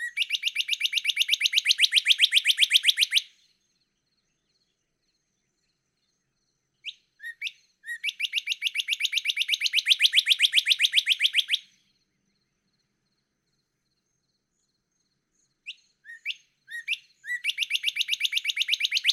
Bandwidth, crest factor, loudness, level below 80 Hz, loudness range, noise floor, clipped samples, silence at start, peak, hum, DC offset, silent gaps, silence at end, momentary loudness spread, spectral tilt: 16 kHz; 22 dB; -22 LUFS; -88 dBFS; 17 LU; -77 dBFS; under 0.1%; 0 s; -6 dBFS; none; under 0.1%; none; 0 s; 19 LU; 7 dB/octave